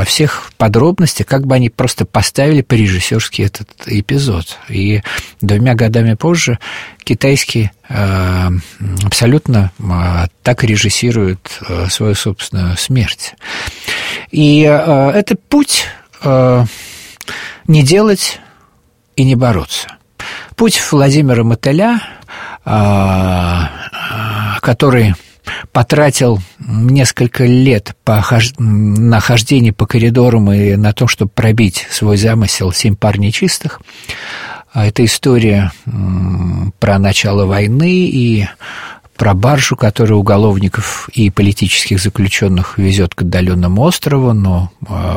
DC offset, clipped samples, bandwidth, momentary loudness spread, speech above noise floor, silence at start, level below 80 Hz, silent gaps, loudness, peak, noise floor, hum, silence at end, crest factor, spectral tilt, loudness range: 0.5%; under 0.1%; 16.5 kHz; 12 LU; 42 dB; 0 s; -34 dBFS; none; -12 LUFS; 0 dBFS; -53 dBFS; none; 0 s; 12 dB; -5.5 dB/octave; 3 LU